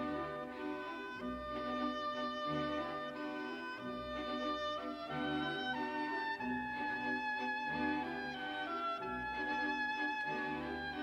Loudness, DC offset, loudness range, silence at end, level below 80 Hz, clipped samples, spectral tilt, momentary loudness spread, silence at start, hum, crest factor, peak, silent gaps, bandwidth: -39 LUFS; under 0.1%; 2 LU; 0 s; -64 dBFS; under 0.1%; -5.5 dB/octave; 6 LU; 0 s; none; 14 dB; -24 dBFS; none; 14.5 kHz